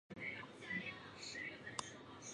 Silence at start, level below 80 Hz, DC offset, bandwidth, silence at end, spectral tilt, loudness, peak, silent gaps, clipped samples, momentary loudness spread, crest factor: 0.1 s; -76 dBFS; under 0.1%; 11 kHz; 0 s; -2.5 dB/octave; -47 LUFS; -20 dBFS; none; under 0.1%; 6 LU; 30 dB